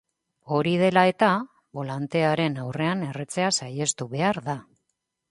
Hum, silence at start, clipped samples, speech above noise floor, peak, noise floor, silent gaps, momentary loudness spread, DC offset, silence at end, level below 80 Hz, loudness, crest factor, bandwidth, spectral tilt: none; 0.45 s; under 0.1%; 55 dB; -6 dBFS; -79 dBFS; none; 13 LU; under 0.1%; 0.7 s; -66 dBFS; -24 LUFS; 20 dB; 11.5 kHz; -4.5 dB/octave